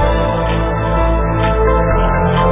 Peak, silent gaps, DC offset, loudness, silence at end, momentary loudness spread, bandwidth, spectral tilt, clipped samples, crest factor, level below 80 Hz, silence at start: -2 dBFS; none; under 0.1%; -15 LUFS; 0 s; 3 LU; 3.8 kHz; -11 dB/octave; under 0.1%; 12 dB; -18 dBFS; 0 s